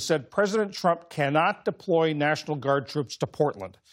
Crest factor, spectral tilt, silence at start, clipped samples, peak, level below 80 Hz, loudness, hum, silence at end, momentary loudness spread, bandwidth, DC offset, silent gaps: 16 dB; -5.5 dB/octave; 0 s; under 0.1%; -10 dBFS; -70 dBFS; -26 LUFS; none; 0.2 s; 7 LU; 16 kHz; under 0.1%; none